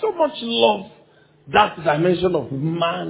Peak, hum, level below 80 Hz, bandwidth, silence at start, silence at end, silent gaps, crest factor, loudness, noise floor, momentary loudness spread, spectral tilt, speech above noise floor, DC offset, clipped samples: 0 dBFS; none; -52 dBFS; 4 kHz; 0 s; 0 s; none; 20 dB; -19 LUFS; -53 dBFS; 5 LU; -9.5 dB/octave; 34 dB; under 0.1%; under 0.1%